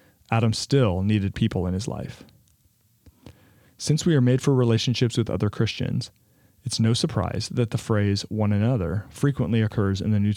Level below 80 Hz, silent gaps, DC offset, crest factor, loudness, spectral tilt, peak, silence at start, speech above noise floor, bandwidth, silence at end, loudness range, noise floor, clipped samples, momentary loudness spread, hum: -52 dBFS; none; under 0.1%; 18 dB; -24 LUFS; -6 dB/octave; -6 dBFS; 0.3 s; 40 dB; 13 kHz; 0 s; 3 LU; -63 dBFS; under 0.1%; 9 LU; none